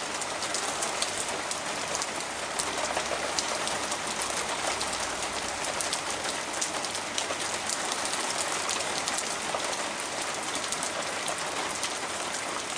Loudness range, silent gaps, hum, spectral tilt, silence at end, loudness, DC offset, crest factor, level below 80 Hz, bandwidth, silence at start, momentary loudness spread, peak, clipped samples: 1 LU; none; none; -0.5 dB/octave; 0 s; -29 LUFS; under 0.1%; 26 dB; -60 dBFS; 10.5 kHz; 0 s; 3 LU; -6 dBFS; under 0.1%